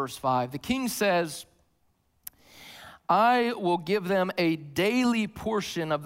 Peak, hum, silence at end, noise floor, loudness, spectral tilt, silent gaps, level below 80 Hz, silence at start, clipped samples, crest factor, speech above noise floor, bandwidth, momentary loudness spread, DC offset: -10 dBFS; none; 0 s; -70 dBFS; -26 LUFS; -5 dB/octave; none; -62 dBFS; 0 s; under 0.1%; 18 dB; 44 dB; 16 kHz; 22 LU; under 0.1%